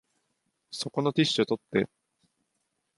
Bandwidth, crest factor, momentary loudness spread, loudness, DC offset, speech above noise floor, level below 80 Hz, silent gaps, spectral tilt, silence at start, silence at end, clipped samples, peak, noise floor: 11.5 kHz; 22 dB; 11 LU; -28 LUFS; under 0.1%; 51 dB; -70 dBFS; none; -5 dB/octave; 0.7 s; 1.1 s; under 0.1%; -10 dBFS; -79 dBFS